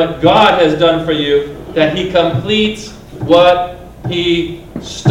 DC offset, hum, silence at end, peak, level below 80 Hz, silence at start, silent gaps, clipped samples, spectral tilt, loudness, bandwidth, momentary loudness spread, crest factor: under 0.1%; none; 0 s; 0 dBFS; -38 dBFS; 0 s; none; 0.4%; -5.5 dB/octave; -12 LUFS; 12.5 kHz; 17 LU; 12 dB